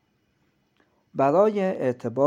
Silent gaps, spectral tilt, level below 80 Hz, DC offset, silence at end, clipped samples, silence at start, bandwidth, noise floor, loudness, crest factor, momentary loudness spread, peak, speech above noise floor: none; -8 dB/octave; -76 dBFS; under 0.1%; 0 s; under 0.1%; 1.15 s; 9 kHz; -68 dBFS; -23 LUFS; 16 dB; 7 LU; -8 dBFS; 47 dB